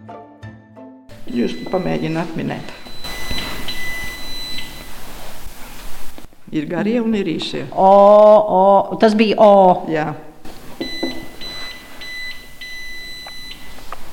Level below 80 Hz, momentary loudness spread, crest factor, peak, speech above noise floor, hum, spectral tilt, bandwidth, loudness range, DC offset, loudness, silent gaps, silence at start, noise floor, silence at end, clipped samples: -38 dBFS; 26 LU; 16 dB; -2 dBFS; 27 dB; none; -5.5 dB/octave; 17 kHz; 17 LU; under 0.1%; -16 LUFS; none; 0 s; -40 dBFS; 0 s; under 0.1%